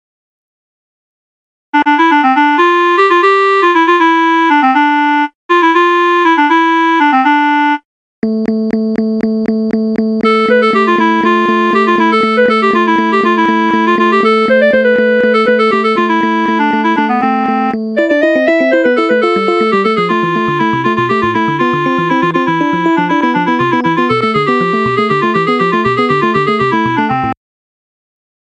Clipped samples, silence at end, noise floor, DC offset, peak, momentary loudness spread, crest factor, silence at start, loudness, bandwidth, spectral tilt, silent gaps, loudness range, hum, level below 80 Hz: under 0.1%; 1.1 s; under -90 dBFS; under 0.1%; 0 dBFS; 5 LU; 10 dB; 1.75 s; -11 LUFS; 8.8 kHz; -6.5 dB/octave; 5.35-5.49 s, 7.85-8.22 s; 3 LU; none; -52 dBFS